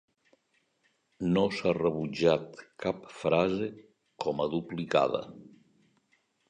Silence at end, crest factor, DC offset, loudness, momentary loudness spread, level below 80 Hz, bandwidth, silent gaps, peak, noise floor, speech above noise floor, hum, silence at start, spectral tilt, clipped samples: 1.05 s; 20 dB; under 0.1%; -30 LUFS; 9 LU; -62 dBFS; 9.8 kHz; none; -10 dBFS; -74 dBFS; 44 dB; none; 1.2 s; -6.5 dB/octave; under 0.1%